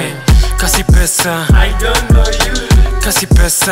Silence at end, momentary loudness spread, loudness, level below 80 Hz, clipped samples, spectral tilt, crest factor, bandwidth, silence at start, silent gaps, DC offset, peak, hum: 0 s; 3 LU; -11 LUFS; -12 dBFS; under 0.1%; -4 dB/octave; 10 dB; 16.5 kHz; 0 s; none; 0.8%; 0 dBFS; none